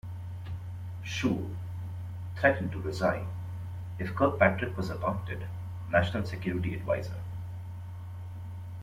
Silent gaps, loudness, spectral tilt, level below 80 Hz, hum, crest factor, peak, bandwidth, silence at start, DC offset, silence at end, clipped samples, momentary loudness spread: none; -32 LUFS; -7 dB/octave; -54 dBFS; none; 24 dB; -8 dBFS; 14.5 kHz; 0.05 s; under 0.1%; 0 s; under 0.1%; 15 LU